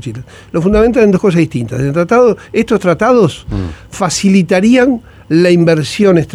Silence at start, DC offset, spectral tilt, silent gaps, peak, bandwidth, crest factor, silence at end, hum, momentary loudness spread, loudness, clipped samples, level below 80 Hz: 0.05 s; under 0.1%; -6 dB/octave; none; 0 dBFS; 14 kHz; 10 dB; 0.1 s; none; 12 LU; -11 LUFS; under 0.1%; -32 dBFS